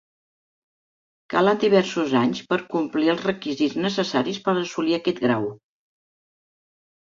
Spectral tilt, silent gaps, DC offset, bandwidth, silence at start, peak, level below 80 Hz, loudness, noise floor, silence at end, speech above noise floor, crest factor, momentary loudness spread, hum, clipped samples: -5.5 dB/octave; none; under 0.1%; 7.6 kHz; 1.3 s; -4 dBFS; -66 dBFS; -22 LUFS; under -90 dBFS; 1.55 s; over 68 dB; 20 dB; 7 LU; none; under 0.1%